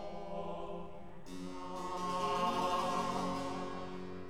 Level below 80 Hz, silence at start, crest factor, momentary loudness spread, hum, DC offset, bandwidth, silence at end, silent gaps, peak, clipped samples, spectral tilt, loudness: -58 dBFS; 0 s; 18 dB; 13 LU; none; 0.4%; 16.5 kHz; 0 s; none; -22 dBFS; under 0.1%; -5 dB/octave; -38 LUFS